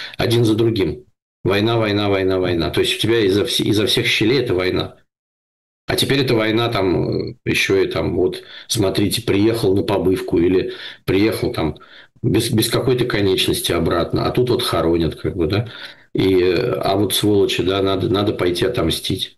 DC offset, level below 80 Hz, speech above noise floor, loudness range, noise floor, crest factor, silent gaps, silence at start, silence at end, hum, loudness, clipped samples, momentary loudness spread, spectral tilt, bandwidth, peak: 0.2%; -42 dBFS; over 72 dB; 2 LU; under -90 dBFS; 10 dB; 1.22-1.44 s, 5.19-5.88 s; 0 s; 0.1 s; none; -18 LUFS; under 0.1%; 7 LU; -5 dB/octave; 13 kHz; -8 dBFS